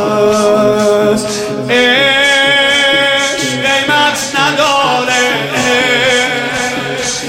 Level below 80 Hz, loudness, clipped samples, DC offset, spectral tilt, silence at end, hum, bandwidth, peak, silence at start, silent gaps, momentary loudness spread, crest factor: -46 dBFS; -10 LUFS; under 0.1%; under 0.1%; -2.5 dB/octave; 0 s; none; 16.5 kHz; 0 dBFS; 0 s; none; 7 LU; 10 dB